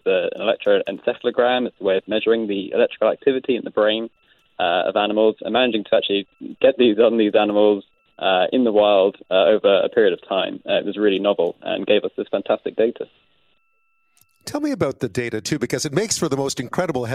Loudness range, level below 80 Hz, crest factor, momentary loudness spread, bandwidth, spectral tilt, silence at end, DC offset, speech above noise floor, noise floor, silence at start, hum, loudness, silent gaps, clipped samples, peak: 7 LU; -60 dBFS; 16 dB; 9 LU; 14.5 kHz; -4.5 dB/octave; 0 s; under 0.1%; 49 dB; -68 dBFS; 0.05 s; none; -20 LUFS; none; under 0.1%; -4 dBFS